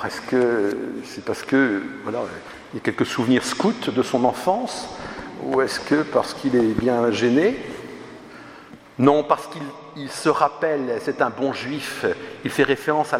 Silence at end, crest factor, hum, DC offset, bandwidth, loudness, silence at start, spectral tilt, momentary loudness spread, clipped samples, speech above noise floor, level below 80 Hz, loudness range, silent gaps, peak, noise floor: 0 s; 22 dB; none; under 0.1%; 15.5 kHz; -22 LUFS; 0 s; -5 dB/octave; 15 LU; under 0.1%; 22 dB; -56 dBFS; 2 LU; none; 0 dBFS; -43 dBFS